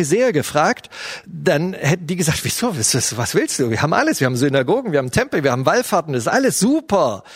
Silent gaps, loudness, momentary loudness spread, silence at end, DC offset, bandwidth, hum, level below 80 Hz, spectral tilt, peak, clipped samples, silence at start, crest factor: none; -18 LUFS; 3 LU; 0 s; under 0.1%; 16 kHz; none; -50 dBFS; -4.5 dB/octave; 0 dBFS; under 0.1%; 0 s; 18 dB